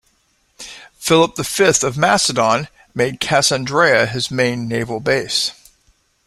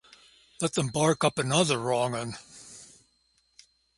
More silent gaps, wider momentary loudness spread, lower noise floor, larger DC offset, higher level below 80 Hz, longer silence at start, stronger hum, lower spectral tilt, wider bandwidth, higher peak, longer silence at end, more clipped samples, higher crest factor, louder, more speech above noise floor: neither; second, 12 LU vs 21 LU; second, -61 dBFS vs -70 dBFS; neither; first, -50 dBFS vs -64 dBFS; about the same, 0.6 s vs 0.6 s; neither; about the same, -3 dB/octave vs -4 dB/octave; first, 15.5 kHz vs 11.5 kHz; first, 0 dBFS vs -8 dBFS; second, 0.75 s vs 1.15 s; neither; about the same, 18 dB vs 22 dB; first, -16 LUFS vs -27 LUFS; about the same, 45 dB vs 43 dB